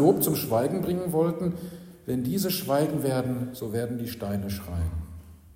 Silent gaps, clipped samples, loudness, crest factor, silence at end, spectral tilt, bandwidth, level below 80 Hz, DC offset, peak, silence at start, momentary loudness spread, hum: none; under 0.1%; -28 LUFS; 20 dB; 0 s; -6 dB/octave; 16.5 kHz; -46 dBFS; under 0.1%; -8 dBFS; 0 s; 13 LU; none